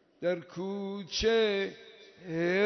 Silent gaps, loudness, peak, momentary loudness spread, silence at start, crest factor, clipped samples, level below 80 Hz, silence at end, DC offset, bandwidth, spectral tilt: none; -31 LUFS; -16 dBFS; 12 LU; 0.2 s; 16 dB; under 0.1%; -56 dBFS; 0 s; under 0.1%; 6.4 kHz; -4.5 dB/octave